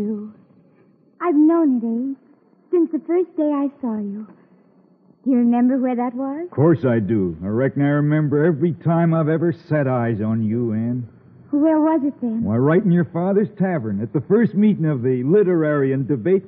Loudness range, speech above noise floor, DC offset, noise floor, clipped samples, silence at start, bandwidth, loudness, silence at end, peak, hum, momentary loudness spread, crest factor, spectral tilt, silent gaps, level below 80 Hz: 3 LU; 37 dB; under 0.1%; -55 dBFS; under 0.1%; 0 s; 4 kHz; -19 LUFS; 0 s; -6 dBFS; none; 9 LU; 14 dB; -9.5 dB/octave; none; -62 dBFS